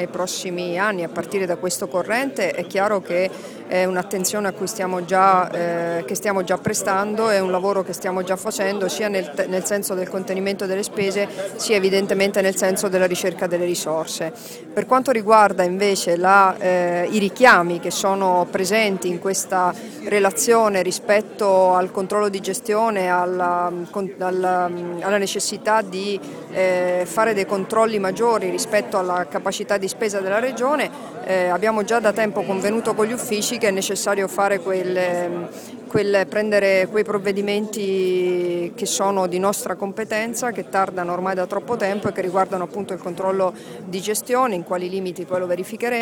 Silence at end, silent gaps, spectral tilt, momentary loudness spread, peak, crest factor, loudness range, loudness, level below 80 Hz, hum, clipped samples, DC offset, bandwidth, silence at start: 0 s; none; -4 dB/octave; 8 LU; 0 dBFS; 20 dB; 5 LU; -20 LUFS; -64 dBFS; none; under 0.1%; under 0.1%; 19 kHz; 0 s